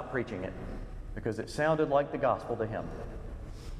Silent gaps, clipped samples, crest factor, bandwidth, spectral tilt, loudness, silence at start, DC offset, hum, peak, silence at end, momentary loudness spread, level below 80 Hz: none; under 0.1%; 20 dB; 13 kHz; -6.5 dB/octave; -32 LUFS; 0 s; under 0.1%; none; -14 dBFS; 0 s; 16 LU; -46 dBFS